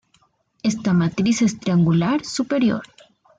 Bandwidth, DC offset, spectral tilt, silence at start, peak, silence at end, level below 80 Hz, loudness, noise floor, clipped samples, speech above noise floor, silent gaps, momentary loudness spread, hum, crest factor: 9.2 kHz; under 0.1%; -6 dB/octave; 0.65 s; -8 dBFS; 0.55 s; -56 dBFS; -20 LUFS; -62 dBFS; under 0.1%; 43 dB; none; 6 LU; none; 12 dB